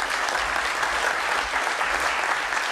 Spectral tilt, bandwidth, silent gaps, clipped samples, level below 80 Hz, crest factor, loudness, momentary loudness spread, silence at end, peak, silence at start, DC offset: -0.5 dB/octave; 14 kHz; none; under 0.1%; -50 dBFS; 16 dB; -23 LUFS; 1 LU; 0 s; -8 dBFS; 0 s; under 0.1%